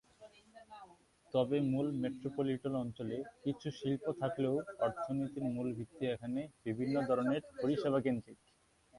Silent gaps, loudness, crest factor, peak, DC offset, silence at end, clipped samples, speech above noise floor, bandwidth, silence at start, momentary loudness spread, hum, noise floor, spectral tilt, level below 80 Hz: none; -37 LUFS; 18 dB; -20 dBFS; under 0.1%; 0 s; under 0.1%; 31 dB; 11.5 kHz; 0.2 s; 8 LU; none; -67 dBFS; -8 dB/octave; -70 dBFS